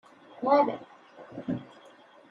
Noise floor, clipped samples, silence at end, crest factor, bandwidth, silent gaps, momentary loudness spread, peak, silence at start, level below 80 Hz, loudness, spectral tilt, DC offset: -55 dBFS; under 0.1%; 0.65 s; 22 dB; 6.2 kHz; none; 17 LU; -10 dBFS; 0.35 s; -70 dBFS; -28 LUFS; -8 dB/octave; under 0.1%